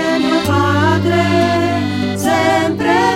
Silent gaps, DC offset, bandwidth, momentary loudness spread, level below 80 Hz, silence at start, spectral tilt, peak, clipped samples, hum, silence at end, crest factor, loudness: none; under 0.1%; 16.5 kHz; 4 LU; -48 dBFS; 0 s; -5.5 dB/octave; 0 dBFS; under 0.1%; none; 0 s; 14 dB; -14 LUFS